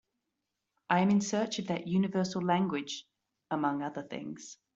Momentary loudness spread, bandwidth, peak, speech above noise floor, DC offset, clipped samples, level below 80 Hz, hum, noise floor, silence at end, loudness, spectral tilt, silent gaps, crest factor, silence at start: 14 LU; 8 kHz; -12 dBFS; 54 dB; under 0.1%; under 0.1%; -72 dBFS; none; -85 dBFS; 0.2 s; -32 LUFS; -5.5 dB/octave; none; 22 dB; 0.9 s